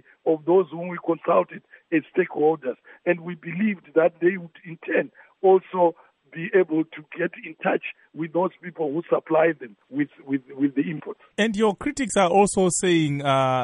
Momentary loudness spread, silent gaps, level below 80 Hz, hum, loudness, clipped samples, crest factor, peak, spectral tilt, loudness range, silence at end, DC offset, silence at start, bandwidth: 14 LU; none; -60 dBFS; none; -23 LUFS; under 0.1%; 18 dB; -6 dBFS; -5 dB/octave; 3 LU; 0 s; under 0.1%; 0.25 s; 11 kHz